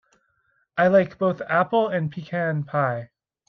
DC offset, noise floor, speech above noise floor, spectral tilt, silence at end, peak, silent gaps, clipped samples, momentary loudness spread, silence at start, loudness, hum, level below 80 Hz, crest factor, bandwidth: under 0.1%; -68 dBFS; 46 dB; -8.5 dB/octave; 0.45 s; -6 dBFS; none; under 0.1%; 9 LU; 0.75 s; -23 LUFS; none; -66 dBFS; 18 dB; 6.2 kHz